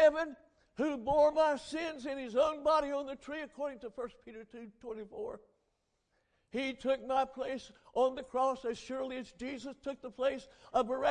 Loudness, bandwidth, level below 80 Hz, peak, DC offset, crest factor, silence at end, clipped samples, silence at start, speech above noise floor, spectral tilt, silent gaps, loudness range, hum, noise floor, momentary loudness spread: -35 LUFS; 10 kHz; -64 dBFS; -16 dBFS; under 0.1%; 18 dB; 0 s; under 0.1%; 0 s; 45 dB; -4.5 dB/octave; none; 12 LU; none; -80 dBFS; 16 LU